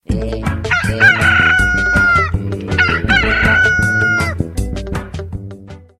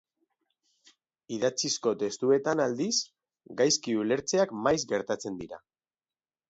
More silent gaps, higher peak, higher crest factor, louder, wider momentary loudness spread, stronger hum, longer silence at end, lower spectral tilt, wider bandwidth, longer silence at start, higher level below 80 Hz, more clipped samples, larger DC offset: neither; first, 0 dBFS vs -12 dBFS; second, 14 dB vs 20 dB; first, -13 LUFS vs -28 LUFS; about the same, 14 LU vs 15 LU; neither; second, 0.2 s vs 0.9 s; first, -5 dB/octave vs -3 dB/octave; first, 14.5 kHz vs 8 kHz; second, 0.1 s vs 1.3 s; first, -26 dBFS vs -68 dBFS; neither; neither